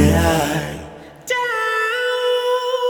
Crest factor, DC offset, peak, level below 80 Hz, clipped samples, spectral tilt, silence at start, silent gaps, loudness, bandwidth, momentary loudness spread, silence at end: 18 dB; under 0.1%; -2 dBFS; -32 dBFS; under 0.1%; -5 dB/octave; 0 s; none; -19 LUFS; over 20 kHz; 15 LU; 0 s